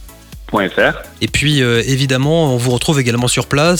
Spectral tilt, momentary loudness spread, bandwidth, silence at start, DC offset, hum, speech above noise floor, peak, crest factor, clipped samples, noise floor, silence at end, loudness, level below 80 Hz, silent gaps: -4.5 dB/octave; 5 LU; 18.5 kHz; 0 s; 0.2%; none; 20 dB; 0 dBFS; 14 dB; under 0.1%; -34 dBFS; 0 s; -14 LUFS; -36 dBFS; none